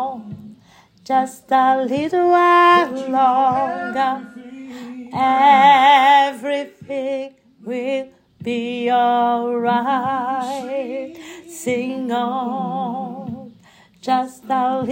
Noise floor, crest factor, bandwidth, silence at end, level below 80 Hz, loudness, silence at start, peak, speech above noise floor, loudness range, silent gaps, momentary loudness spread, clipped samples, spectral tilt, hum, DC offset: -50 dBFS; 18 dB; 16 kHz; 0 s; -68 dBFS; -17 LUFS; 0 s; -2 dBFS; 33 dB; 9 LU; none; 22 LU; under 0.1%; -4.5 dB/octave; none; under 0.1%